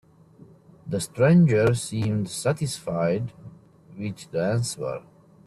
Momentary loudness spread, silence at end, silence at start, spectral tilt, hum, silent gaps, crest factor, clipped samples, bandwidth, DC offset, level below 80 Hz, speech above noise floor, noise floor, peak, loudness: 17 LU; 0.45 s; 0.85 s; -6.5 dB/octave; none; none; 18 dB; under 0.1%; 12.5 kHz; under 0.1%; -58 dBFS; 28 dB; -51 dBFS; -8 dBFS; -24 LUFS